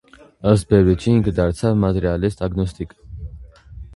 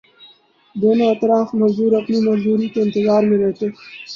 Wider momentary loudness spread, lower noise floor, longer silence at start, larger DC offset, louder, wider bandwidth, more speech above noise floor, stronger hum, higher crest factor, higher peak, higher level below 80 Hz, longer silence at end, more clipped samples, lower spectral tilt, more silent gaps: first, 20 LU vs 9 LU; second, -39 dBFS vs -49 dBFS; second, 0.45 s vs 0.75 s; neither; about the same, -18 LUFS vs -17 LUFS; first, 11.5 kHz vs 7 kHz; second, 22 dB vs 33 dB; neither; about the same, 18 dB vs 14 dB; first, 0 dBFS vs -4 dBFS; first, -34 dBFS vs -60 dBFS; about the same, 0 s vs 0 s; neither; about the same, -8 dB/octave vs -8 dB/octave; neither